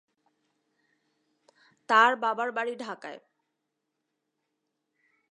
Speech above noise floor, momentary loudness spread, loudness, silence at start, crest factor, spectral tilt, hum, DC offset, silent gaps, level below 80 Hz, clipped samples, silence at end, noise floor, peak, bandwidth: 56 dB; 19 LU; -25 LUFS; 1.9 s; 24 dB; -2.5 dB/octave; none; under 0.1%; none; under -90 dBFS; under 0.1%; 2.15 s; -83 dBFS; -8 dBFS; 11 kHz